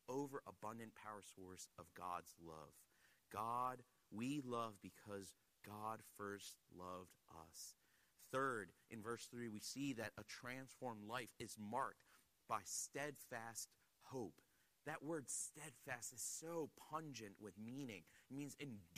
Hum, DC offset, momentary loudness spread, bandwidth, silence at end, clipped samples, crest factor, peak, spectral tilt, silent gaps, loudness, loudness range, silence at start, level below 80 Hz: none; under 0.1%; 13 LU; 15 kHz; 0 s; under 0.1%; 22 dB; -30 dBFS; -3.5 dB/octave; none; -51 LUFS; 4 LU; 0.1 s; -84 dBFS